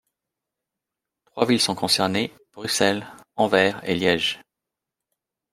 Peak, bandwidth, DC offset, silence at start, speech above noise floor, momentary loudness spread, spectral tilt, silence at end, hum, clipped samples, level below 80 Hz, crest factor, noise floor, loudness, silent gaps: -2 dBFS; 16 kHz; under 0.1%; 1.35 s; 64 dB; 14 LU; -3.5 dB/octave; 1.15 s; none; under 0.1%; -64 dBFS; 22 dB; -86 dBFS; -22 LUFS; none